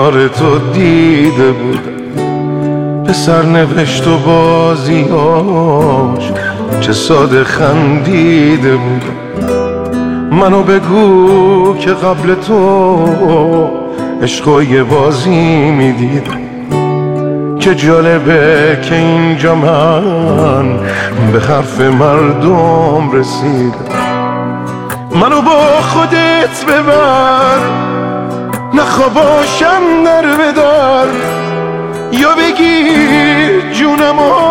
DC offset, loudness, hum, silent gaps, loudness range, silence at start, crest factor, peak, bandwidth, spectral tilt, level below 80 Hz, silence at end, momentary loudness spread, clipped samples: under 0.1%; -9 LUFS; none; none; 2 LU; 0 s; 8 dB; 0 dBFS; 17.5 kHz; -6 dB/octave; -40 dBFS; 0 s; 8 LU; under 0.1%